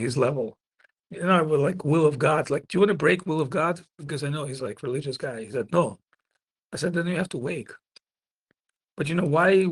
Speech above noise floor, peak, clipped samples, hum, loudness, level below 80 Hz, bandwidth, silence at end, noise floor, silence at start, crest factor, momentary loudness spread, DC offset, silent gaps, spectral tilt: over 66 dB; -6 dBFS; under 0.1%; none; -25 LUFS; -64 dBFS; 12 kHz; 0 s; under -90 dBFS; 0 s; 18 dB; 12 LU; under 0.1%; none; -6.5 dB/octave